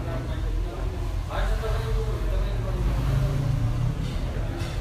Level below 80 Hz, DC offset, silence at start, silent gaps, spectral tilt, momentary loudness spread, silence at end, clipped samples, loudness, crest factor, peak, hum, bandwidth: -28 dBFS; under 0.1%; 0 s; none; -7 dB/octave; 5 LU; 0 s; under 0.1%; -28 LUFS; 12 dB; -14 dBFS; none; 14 kHz